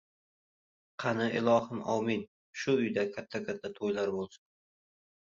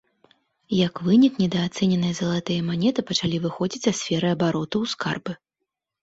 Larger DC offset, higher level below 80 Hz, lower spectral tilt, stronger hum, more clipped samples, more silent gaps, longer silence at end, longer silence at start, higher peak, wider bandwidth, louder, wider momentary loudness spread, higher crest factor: neither; second, -72 dBFS vs -58 dBFS; about the same, -6 dB/octave vs -5.5 dB/octave; neither; neither; first, 2.28-2.53 s vs none; first, 0.85 s vs 0.7 s; first, 1 s vs 0.7 s; second, -14 dBFS vs -6 dBFS; about the same, 7.6 kHz vs 8 kHz; second, -32 LUFS vs -23 LUFS; first, 11 LU vs 8 LU; about the same, 18 dB vs 16 dB